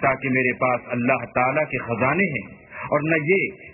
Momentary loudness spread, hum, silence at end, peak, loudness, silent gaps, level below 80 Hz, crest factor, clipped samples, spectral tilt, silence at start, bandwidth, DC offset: 5 LU; none; 0 s; -4 dBFS; -22 LUFS; none; -54 dBFS; 18 dB; under 0.1%; -12 dB/octave; 0 s; 3 kHz; under 0.1%